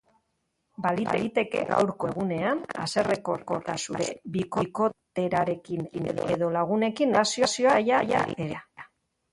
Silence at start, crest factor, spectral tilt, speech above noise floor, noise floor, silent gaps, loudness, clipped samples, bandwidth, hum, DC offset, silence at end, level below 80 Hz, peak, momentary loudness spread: 0.8 s; 20 dB; -4.5 dB/octave; 50 dB; -77 dBFS; none; -27 LUFS; under 0.1%; 11.5 kHz; none; under 0.1%; 0.45 s; -62 dBFS; -8 dBFS; 9 LU